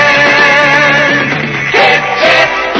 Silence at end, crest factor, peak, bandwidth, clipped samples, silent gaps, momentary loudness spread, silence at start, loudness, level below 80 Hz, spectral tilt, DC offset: 0 s; 8 dB; 0 dBFS; 8 kHz; 0.9%; none; 5 LU; 0 s; -7 LUFS; -44 dBFS; -3.5 dB/octave; under 0.1%